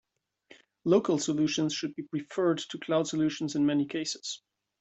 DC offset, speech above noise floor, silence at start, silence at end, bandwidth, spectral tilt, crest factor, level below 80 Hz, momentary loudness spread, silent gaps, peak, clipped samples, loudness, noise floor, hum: under 0.1%; 32 dB; 0.85 s; 0.45 s; 8.2 kHz; -5 dB/octave; 18 dB; -70 dBFS; 10 LU; none; -12 dBFS; under 0.1%; -29 LUFS; -60 dBFS; none